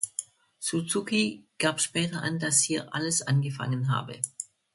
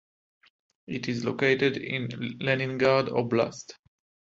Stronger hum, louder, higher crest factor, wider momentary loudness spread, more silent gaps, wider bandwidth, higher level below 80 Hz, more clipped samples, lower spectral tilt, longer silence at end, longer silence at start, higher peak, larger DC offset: neither; about the same, -28 LUFS vs -27 LUFS; about the same, 20 dB vs 20 dB; about the same, 10 LU vs 11 LU; neither; first, 12 kHz vs 7.8 kHz; about the same, -68 dBFS vs -64 dBFS; neither; second, -3.5 dB/octave vs -6 dB/octave; second, 0.3 s vs 0.55 s; second, 0 s vs 0.9 s; about the same, -8 dBFS vs -8 dBFS; neither